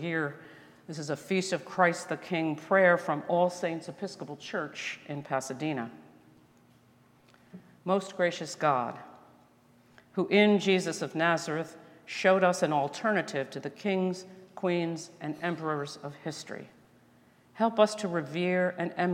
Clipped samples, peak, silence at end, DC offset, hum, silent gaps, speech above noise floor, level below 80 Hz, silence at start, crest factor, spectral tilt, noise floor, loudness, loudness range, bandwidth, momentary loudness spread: under 0.1%; -8 dBFS; 0 s; under 0.1%; none; none; 32 dB; -80 dBFS; 0 s; 22 dB; -5 dB/octave; -62 dBFS; -30 LUFS; 9 LU; 16 kHz; 16 LU